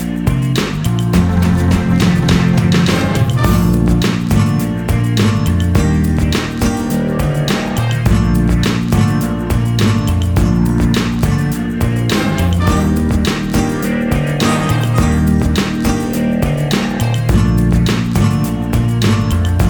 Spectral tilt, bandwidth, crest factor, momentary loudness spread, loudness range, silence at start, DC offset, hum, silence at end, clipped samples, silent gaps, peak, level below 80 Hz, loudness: -6.5 dB/octave; over 20 kHz; 12 dB; 4 LU; 2 LU; 0 s; under 0.1%; none; 0 s; under 0.1%; none; 0 dBFS; -22 dBFS; -14 LUFS